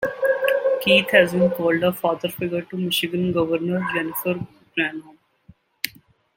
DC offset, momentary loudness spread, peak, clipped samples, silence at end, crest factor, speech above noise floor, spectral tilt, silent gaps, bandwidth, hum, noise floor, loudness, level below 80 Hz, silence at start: under 0.1%; 13 LU; -2 dBFS; under 0.1%; 0.45 s; 20 dB; 33 dB; -5 dB/octave; none; 17 kHz; none; -54 dBFS; -21 LUFS; -60 dBFS; 0 s